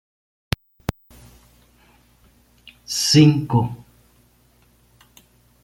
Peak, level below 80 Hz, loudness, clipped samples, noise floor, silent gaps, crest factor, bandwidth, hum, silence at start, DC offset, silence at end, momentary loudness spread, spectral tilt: -2 dBFS; -48 dBFS; -19 LUFS; under 0.1%; -57 dBFS; none; 22 dB; 16.5 kHz; 60 Hz at -50 dBFS; 2.9 s; under 0.1%; 1.9 s; 20 LU; -5 dB/octave